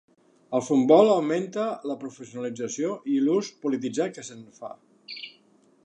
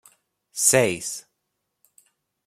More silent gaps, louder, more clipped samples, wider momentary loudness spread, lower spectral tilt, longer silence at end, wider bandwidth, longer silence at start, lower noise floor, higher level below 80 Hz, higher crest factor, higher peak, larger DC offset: neither; second, -25 LUFS vs -20 LUFS; neither; first, 23 LU vs 19 LU; first, -5.5 dB/octave vs -2.5 dB/octave; second, 0.55 s vs 1.25 s; second, 9.6 kHz vs 16 kHz; about the same, 0.5 s vs 0.55 s; second, -60 dBFS vs -78 dBFS; second, -80 dBFS vs -64 dBFS; about the same, 22 dB vs 24 dB; about the same, -4 dBFS vs -4 dBFS; neither